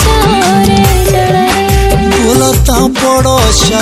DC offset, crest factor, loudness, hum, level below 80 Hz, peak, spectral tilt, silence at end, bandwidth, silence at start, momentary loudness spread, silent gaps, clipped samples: under 0.1%; 8 dB; -8 LUFS; none; -16 dBFS; 0 dBFS; -4.5 dB/octave; 0 s; 16.5 kHz; 0 s; 2 LU; none; 0.6%